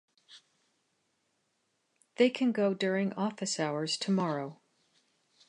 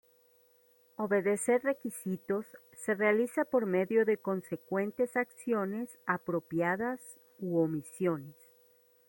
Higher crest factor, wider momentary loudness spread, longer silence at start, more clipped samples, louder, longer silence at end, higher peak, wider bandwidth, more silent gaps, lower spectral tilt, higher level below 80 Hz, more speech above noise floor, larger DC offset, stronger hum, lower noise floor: about the same, 22 dB vs 18 dB; second, 7 LU vs 11 LU; second, 0.3 s vs 1 s; neither; about the same, -31 LUFS vs -32 LUFS; first, 0.95 s vs 0.75 s; first, -12 dBFS vs -16 dBFS; second, 11 kHz vs 16.5 kHz; neither; second, -5 dB/octave vs -6.5 dB/octave; second, -84 dBFS vs -78 dBFS; first, 48 dB vs 34 dB; neither; neither; first, -78 dBFS vs -66 dBFS